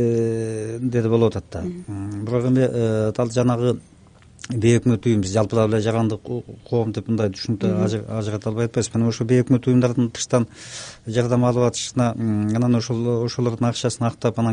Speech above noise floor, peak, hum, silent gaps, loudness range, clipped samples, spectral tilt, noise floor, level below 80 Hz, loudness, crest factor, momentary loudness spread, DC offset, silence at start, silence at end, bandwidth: 28 dB; -4 dBFS; none; none; 2 LU; under 0.1%; -6.5 dB/octave; -48 dBFS; -52 dBFS; -21 LUFS; 16 dB; 11 LU; under 0.1%; 0 s; 0 s; 10 kHz